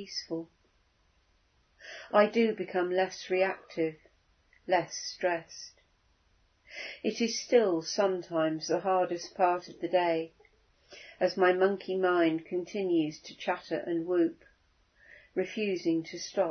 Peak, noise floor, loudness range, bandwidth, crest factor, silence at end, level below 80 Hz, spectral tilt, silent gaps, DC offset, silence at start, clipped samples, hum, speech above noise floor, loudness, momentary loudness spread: -10 dBFS; -69 dBFS; 4 LU; 6.6 kHz; 22 dB; 0 s; -74 dBFS; -4.5 dB/octave; none; under 0.1%; 0 s; under 0.1%; none; 39 dB; -30 LUFS; 14 LU